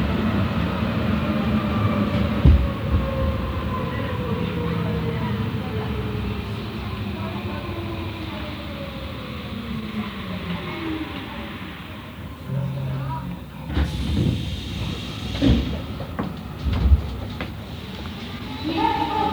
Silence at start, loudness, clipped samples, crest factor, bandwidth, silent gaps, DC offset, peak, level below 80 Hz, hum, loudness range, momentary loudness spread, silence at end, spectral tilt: 0 s; -25 LUFS; under 0.1%; 22 dB; over 20 kHz; none; under 0.1%; -2 dBFS; -30 dBFS; none; 8 LU; 12 LU; 0 s; -7.5 dB/octave